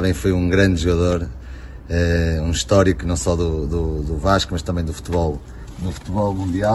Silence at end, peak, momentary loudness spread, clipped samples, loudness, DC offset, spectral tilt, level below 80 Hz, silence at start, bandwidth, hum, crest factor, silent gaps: 0 s; -2 dBFS; 13 LU; under 0.1%; -20 LUFS; under 0.1%; -6 dB/octave; -28 dBFS; 0 s; 12.5 kHz; none; 18 dB; none